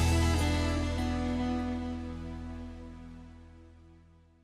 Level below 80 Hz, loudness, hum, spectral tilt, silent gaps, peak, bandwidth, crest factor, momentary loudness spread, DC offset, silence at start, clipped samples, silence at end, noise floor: -38 dBFS; -32 LUFS; none; -5.5 dB/octave; none; -16 dBFS; 13.5 kHz; 16 dB; 21 LU; under 0.1%; 0 s; under 0.1%; 0.5 s; -59 dBFS